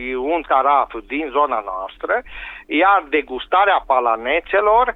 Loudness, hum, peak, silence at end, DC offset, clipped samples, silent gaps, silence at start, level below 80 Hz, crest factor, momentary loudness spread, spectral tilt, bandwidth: -18 LUFS; none; -2 dBFS; 0 s; under 0.1%; under 0.1%; none; 0 s; -46 dBFS; 16 dB; 10 LU; -6 dB/octave; 4.1 kHz